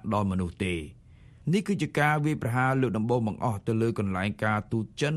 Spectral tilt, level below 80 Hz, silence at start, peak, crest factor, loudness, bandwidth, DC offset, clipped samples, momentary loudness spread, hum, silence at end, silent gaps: -7 dB/octave; -54 dBFS; 0.05 s; -10 dBFS; 18 dB; -28 LUFS; 13.5 kHz; under 0.1%; under 0.1%; 7 LU; none; 0 s; none